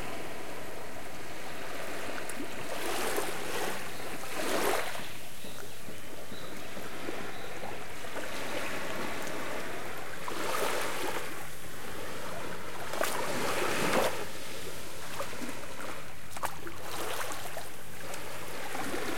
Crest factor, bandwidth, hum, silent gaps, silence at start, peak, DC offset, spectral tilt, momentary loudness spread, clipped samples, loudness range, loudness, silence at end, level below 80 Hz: 22 dB; 17 kHz; none; none; 0 s; -16 dBFS; 3%; -3 dB/octave; 11 LU; under 0.1%; 6 LU; -37 LUFS; 0 s; -62 dBFS